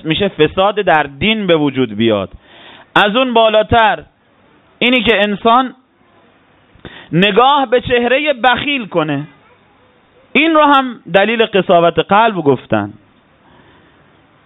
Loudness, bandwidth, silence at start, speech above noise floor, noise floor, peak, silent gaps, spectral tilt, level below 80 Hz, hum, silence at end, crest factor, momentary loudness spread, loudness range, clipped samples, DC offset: -12 LUFS; 4.1 kHz; 0.05 s; 38 dB; -50 dBFS; 0 dBFS; none; -7.5 dB/octave; -44 dBFS; none; 1.55 s; 14 dB; 8 LU; 2 LU; under 0.1%; under 0.1%